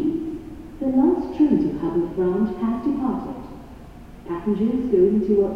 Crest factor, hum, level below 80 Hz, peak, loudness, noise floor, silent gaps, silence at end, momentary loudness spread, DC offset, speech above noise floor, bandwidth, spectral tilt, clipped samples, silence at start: 14 dB; none; -44 dBFS; -8 dBFS; -22 LUFS; -41 dBFS; none; 0 s; 20 LU; 0.2%; 21 dB; 6.6 kHz; -9.5 dB/octave; under 0.1%; 0 s